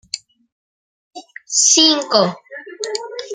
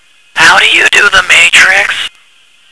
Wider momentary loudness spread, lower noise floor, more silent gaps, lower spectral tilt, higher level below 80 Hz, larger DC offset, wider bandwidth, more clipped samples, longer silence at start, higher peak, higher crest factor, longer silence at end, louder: first, 20 LU vs 13 LU; first, under -90 dBFS vs -45 dBFS; first, 0.52-1.11 s vs none; first, -1.5 dB/octave vs 0.5 dB/octave; second, -68 dBFS vs -42 dBFS; second, under 0.1% vs 2%; about the same, 12 kHz vs 11 kHz; second, under 0.1% vs 5%; second, 0.15 s vs 0.35 s; about the same, 0 dBFS vs 0 dBFS; first, 20 dB vs 8 dB; second, 0 s vs 0.65 s; second, -14 LUFS vs -4 LUFS